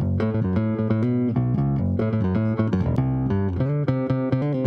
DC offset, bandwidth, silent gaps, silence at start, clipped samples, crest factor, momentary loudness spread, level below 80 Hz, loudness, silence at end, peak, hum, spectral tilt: under 0.1%; 5.4 kHz; none; 0 s; under 0.1%; 14 dB; 1 LU; -42 dBFS; -23 LUFS; 0 s; -8 dBFS; none; -11 dB/octave